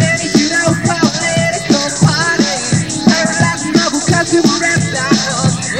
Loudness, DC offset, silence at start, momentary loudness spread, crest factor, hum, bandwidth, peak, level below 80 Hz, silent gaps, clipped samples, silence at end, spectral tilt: -12 LUFS; 0.4%; 0 s; 3 LU; 12 dB; none; 15 kHz; 0 dBFS; -42 dBFS; none; 0.1%; 0 s; -4 dB/octave